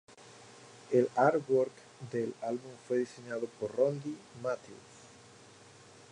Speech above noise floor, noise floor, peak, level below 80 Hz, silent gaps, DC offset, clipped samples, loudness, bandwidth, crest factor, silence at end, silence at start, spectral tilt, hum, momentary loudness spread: 24 dB; -56 dBFS; -12 dBFS; -78 dBFS; none; under 0.1%; under 0.1%; -33 LUFS; 10.5 kHz; 22 dB; 1.05 s; 0.25 s; -6.5 dB/octave; none; 25 LU